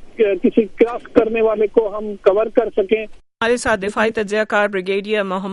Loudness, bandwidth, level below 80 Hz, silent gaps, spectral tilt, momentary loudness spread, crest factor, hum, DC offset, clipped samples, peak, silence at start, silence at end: -18 LUFS; 11.5 kHz; -46 dBFS; none; -5 dB/octave; 5 LU; 18 dB; none; under 0.1%; under 0.1%; 0 dBFS; 0 s; 0 s